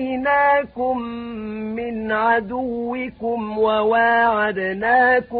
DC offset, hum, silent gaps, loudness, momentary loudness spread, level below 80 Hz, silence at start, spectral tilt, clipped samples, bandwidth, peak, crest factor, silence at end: under 0.1%; none; none; -20 LUFS; 11 LU; -52 dBFS; 0 s; -10 dB/octave; under 0.1%; 4.9 kHz; -6 dBFS; 14 dB; 0 s